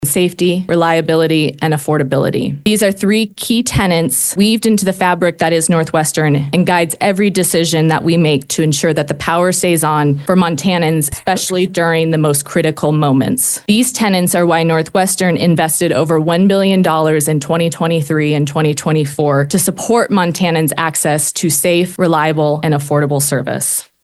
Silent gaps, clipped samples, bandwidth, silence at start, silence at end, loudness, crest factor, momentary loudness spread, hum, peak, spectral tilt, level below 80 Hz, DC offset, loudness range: none; under 0.1%; 13 kHz; 0 s; 0.2 s; -13 LUFS; 12 dB; 3 LU; none; 0 dBFS; -4.5 dB/octave; -46 dBFS; under 0.1%; 1 LU